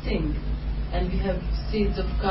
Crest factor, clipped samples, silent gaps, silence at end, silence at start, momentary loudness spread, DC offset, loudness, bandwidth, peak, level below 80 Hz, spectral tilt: 14 dB; under 0.1%; none; 0 s; 0 s; 5 LU; under 0.1%; -28 LUFS; 5.8 kHz; -10 dBFS; -28 dBFS; -11 dB/octave